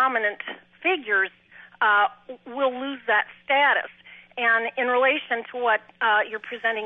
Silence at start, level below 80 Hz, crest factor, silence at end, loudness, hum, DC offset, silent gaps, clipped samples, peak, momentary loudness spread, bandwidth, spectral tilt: 0 s; -78 dBFS; 16 dB; 0 s; -23 LUFS; none; under 0.1%; none; under 0.1%; -8 dBFS; 11 LU; 4.2 kHz; -5 dB/octave